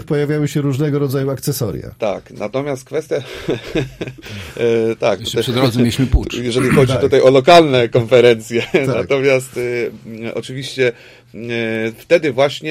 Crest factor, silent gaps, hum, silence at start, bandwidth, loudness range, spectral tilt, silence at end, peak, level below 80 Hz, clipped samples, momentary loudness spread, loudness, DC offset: 16 dB; none; none; 0 s; 16 kHz; 9 LU; -6 dB/octave; 0 s; 0 dBFS; -34 dBFS; under 0.1%; 14 LU; -16 LUFS; under 0.1%